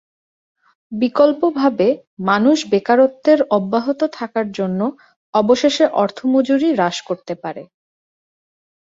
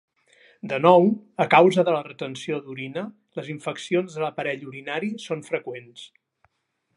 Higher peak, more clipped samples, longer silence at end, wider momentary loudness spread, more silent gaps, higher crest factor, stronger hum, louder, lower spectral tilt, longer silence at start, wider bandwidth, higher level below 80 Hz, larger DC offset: about the same, -2 dBFS vs -2 dBFS; neither; first, 1.15 s vs 0.9 s; second, 11 LU vs 19 LU; first, 2.07-2.17 s, 5.16-5.33 s vs none; second, 16 dB vs 22 dB; neither; first, -17 LUFS vs -23 LUFS; about the same, -5.5 dB/octave vs -6 dB/octave; first, 0.9 s vs 0.65 s; second, 7.8 kHz vs 11.5 kHz; first, -62 dBFS vs -76 dBFS; neither